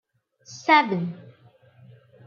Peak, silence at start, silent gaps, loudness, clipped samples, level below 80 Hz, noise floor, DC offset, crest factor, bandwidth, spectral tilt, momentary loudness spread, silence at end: -4 dBFS; 0.5 s; none; -22 LUFS; under 0.1%; -76 dBFS; -55 dBFS; under 0.1%; 22 dB; 7.2 kHz; -5 dB/octave; 25 LU; 1.05 s